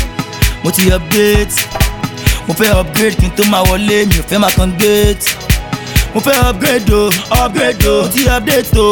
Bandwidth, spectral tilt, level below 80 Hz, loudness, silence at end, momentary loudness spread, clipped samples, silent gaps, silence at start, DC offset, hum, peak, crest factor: 18.5 kHz; -4.5 dB/octave; -18 dBFS; -11 LUFS; 0 s; 5 LU; under 0.1%; none; 0 s; under 0.1%; none; 0 dBFS; 12 dB